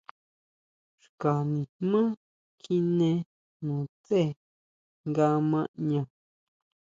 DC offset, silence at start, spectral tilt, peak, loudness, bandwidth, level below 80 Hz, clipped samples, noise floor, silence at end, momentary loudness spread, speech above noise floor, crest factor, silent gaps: under 0.1%; 1.2 s; -9 dB/octave; -12 dBFS; -28 LUFS; 7.6 kHz; -72 dBFS; under 0.1%; under -90 dBFS; 0.9 s; 14 LU; over 63 dB; 18 dB; 1.69-1.80 s, 2.17-2.58 s, 3.26-3.60 s, 3.89-4.04 s, 4.36-5.04 s, 5.68-5.74 s